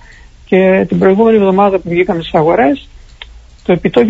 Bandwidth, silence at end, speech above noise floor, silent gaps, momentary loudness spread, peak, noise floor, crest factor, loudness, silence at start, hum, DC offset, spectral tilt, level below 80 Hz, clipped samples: 7.6 kHz; 0 s; 28 dB; none; 6 LU; 0 dBFS; -37 dBFS; 12 dB; -11 LUFS; 0.5 s; none; under 0.1%; -8.5 dB/octave; -38 dBFS; under 0.1%